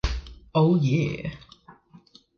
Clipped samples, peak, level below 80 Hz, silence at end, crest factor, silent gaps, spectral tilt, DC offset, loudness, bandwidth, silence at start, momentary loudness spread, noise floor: under 0.1%; -8 dBFS; -38 dBFS; 0.65 s; 18 dB; none; -7.5 dB/octave; under 0.1%; -24 LUFS; 7 kHz; 0.05 s; 16 LU; -54 dBFS